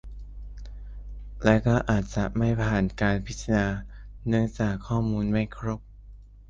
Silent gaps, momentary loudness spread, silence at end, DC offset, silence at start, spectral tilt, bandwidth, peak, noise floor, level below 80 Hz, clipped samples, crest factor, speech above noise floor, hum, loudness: none; 20 LU; 0 s; under 0.1%; 0.05 s; -7 dB/octave; 7.6 kHz; -4 dBFS; -47 dBFS; -38 dBFS; under 0.1%; 22 dB; 22 dB; none; -26 LUFS